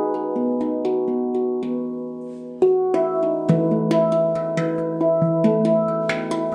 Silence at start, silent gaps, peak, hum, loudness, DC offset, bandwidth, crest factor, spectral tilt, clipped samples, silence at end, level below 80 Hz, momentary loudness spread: 0 s; none; -6 dBFS; none; -21 LUFS; under 0.1%; 10 kHz; 14 dB; -8 dB/octave; under 0.1%; 0 s; -66 dBFS; 8 LU